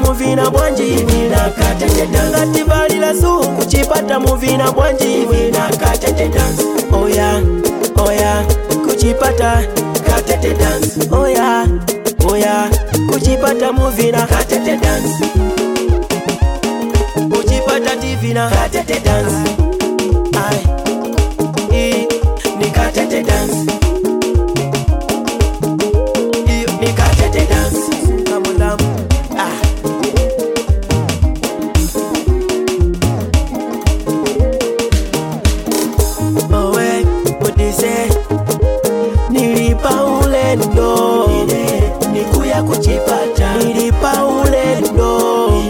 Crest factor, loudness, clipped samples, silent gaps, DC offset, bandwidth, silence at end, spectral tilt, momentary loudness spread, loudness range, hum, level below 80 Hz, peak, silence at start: 12 dB; -14 LUFS; under 0.1%; none; under 0.1%; 17.5 kHz; 0 s; -5.5 dB/octave; 4 LU; 3 LU; none; -18 dBFS; -2 dBFS; 0 s